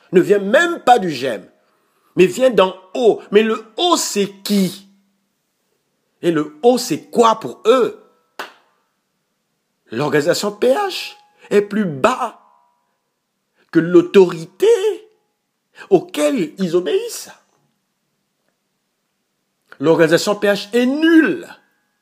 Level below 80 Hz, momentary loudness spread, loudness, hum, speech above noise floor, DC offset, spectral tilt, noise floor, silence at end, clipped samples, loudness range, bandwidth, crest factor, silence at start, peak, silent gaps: -66 dBFS; 13 LU; -16 LUFS; none; 56 dB; under 0.1%; -4.5 dB/octave; -71 dBFS; 0.5 s; under 0.1%; 5 LU; 15.5 kHz; 18 dB; 0.1 s; 0 dBFS; none